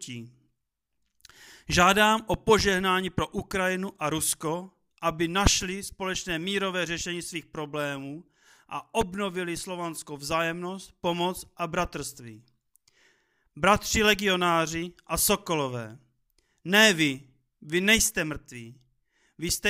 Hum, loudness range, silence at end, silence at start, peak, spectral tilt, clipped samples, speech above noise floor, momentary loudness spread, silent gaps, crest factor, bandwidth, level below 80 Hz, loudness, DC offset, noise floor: none; 8 LU; 0 s; 0 s; -4 dBFS; -3 dB/octave; under 0.1%; 55 dB; 17 LU; none; 24 dB; 16 kHz; -46 dBFS; -26 LUFS; under 0.1%; -82 dBFS